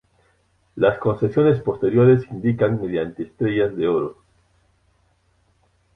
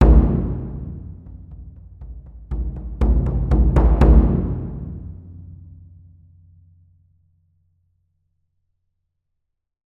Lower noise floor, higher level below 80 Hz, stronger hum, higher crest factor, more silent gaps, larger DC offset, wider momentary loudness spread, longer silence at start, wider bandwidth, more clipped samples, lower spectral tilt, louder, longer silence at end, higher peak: second, -63 dBFS vs -77 dBFS; second, -52 dBFS vs -22 dBFS; neither; about the same, 18 dB vs 18 dB; neither; neither; second, 10 LU vs 26 LU; first, 0.75 s vs 0 s; first, 3.9 kHz vs 3 kHz; neither; about the same, -10 dB/octave vs -10.5 dB/octave; about the same, -20 LUFS vs -19 LUFS; second, 1.85 s vs 4.45 s; about the same, -4 dBFS vs -2 dBFS